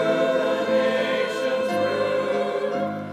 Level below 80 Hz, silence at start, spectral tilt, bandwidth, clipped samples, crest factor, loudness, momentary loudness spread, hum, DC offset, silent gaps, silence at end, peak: -72 dBFS; 0 s; -5 dB/octave; 13 kHz; under 0.1%; 12 dB; -23 LUFS; 4 LU; none; under 0.1%; none; 0 s; -10 dBFS